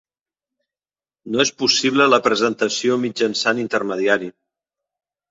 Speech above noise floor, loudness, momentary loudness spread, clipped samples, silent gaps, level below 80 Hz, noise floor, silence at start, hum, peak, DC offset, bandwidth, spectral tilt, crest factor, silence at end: over 72 dB; -18 LUFS; 7 LU; under 0.1%; none; -64 dBFS; under -90 dBFS; 1.25 s; none; 0 dBFS; under 0.1%; 8 kHz; -3 dB/octave; 20 dB; 1 s